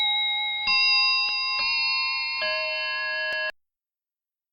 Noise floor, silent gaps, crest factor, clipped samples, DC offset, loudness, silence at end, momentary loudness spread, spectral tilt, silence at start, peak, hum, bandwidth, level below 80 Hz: under -90 dBFS; none; 14 dB; under 0.1%; under 0.1%; -22 LUFS; 1 s; 8 LU; 0.5 dB/octave; 0 s; -12 dBFS; none; 8.8 kHz; -60 dBFS